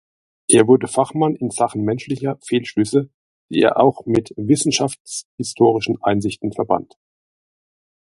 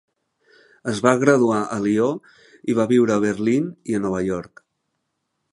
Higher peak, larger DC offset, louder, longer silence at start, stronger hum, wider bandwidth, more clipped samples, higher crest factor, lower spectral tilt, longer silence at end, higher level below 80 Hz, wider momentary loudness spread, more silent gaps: about the same, 0 dBFS vs 0 dBFS; neither; about the same, -18 LUFS vs -20 LUFS; second, 0.5 s vs 0.85 s; neither; about the same, 11.5 kHz vs 11.5 kHz; neither; about the same, 18 dB vs 22 dB; about the same, -5 dB/octave vs -6 dB/octave; first, 1.3 s vs 1.05 s; about the same, -54 dBFS vs -58 dBFS; about the same, 10 LU vs 12 LU; first, 3.14-3.49 s, 5.00-5.05 s, 5.25-5.38 s vs none